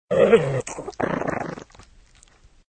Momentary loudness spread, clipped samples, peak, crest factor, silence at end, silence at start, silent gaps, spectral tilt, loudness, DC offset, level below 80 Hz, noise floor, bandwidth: 17 LU; under 0.1%; -2 dBFS; 22 dB; 1.15 s; 0.1 s; none; -6 dB/octave; -22 LUFS; under 0.1%; -52 dBFS; -53 dBFS; 9.2 kHz